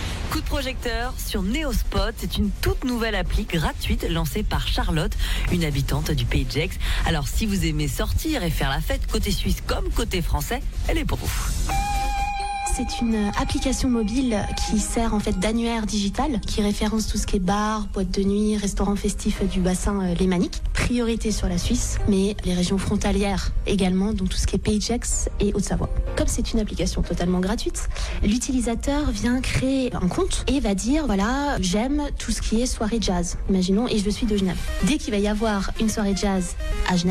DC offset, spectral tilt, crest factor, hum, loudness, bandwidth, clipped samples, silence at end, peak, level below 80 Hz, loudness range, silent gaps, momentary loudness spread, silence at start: under 0.1%; -5 dB/octave; 12 dB; none; -24 LUFS; 17 kHz; under 0.1%; 0 s; -10 dBFS; -28 dBFS; 2 LU; none; 4 LU; 0 s